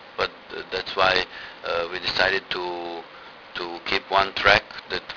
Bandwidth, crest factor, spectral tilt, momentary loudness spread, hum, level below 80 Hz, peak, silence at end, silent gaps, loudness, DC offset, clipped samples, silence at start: 5.4 kHz; 24 dB; -3.5 dB/octave; 17 LU; none; -50 dBFS; 0 dBFS; 0 s; none; -23 LUFS; under 0.1%; under 0.1%; 0 s